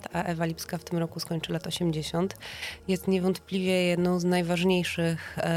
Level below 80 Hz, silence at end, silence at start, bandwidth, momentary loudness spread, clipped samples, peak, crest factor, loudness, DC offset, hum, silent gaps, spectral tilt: -56 dBFS; 0 s; 0 s; 16 kHz; 8 LU; under 0.1%; -12 dBFS; 16 dB; -28 LUFS; under 0.1%; none; none; -5.5 dB/octave